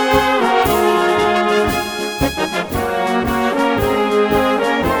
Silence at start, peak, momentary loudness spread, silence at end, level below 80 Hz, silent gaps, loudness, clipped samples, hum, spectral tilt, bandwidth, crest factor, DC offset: 0 s; -2 dBFS; 5 LU; 0 s; -34 dBFS; none; -16 LUFS; under 0.1%; none; -4.5 dB/octave; over 20 kHz; 14 dB; under 0.1%